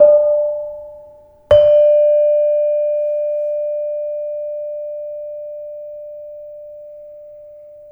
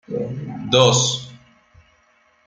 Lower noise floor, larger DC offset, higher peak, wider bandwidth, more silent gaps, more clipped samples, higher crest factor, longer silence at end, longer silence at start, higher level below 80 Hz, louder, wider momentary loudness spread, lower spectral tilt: second, -43 dBFS vs -59 dBFS; neither; about the same, 0 dBFS vs 0 dBFS; second, 3.2 kHz vs 9.6 kHz; neither; neither; about the same, 16 dB vs 20 dB; second, 0 s vs 1.1 s; about the same, 0 s vs 0.1 s; first, -50 dBFS vs -56 dBFS; about the same, -16 LUFS vs -18 LUFS; first, 25 LU vs 16 LU; first, -6 dB/octave vs -3.5 dB/octave